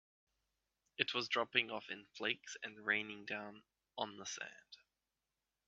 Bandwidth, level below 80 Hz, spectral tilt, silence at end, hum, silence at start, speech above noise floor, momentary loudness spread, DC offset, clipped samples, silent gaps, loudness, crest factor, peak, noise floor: 7.4 kHz; -88 dBFS; 0 dB/octave; 0.9 s; none; 1 s; over 48 dB; 16 LU; under 0.1%; under 0.1%; none; -40 LUFS; 30 dB; -14 dBFS; under -90 dBFS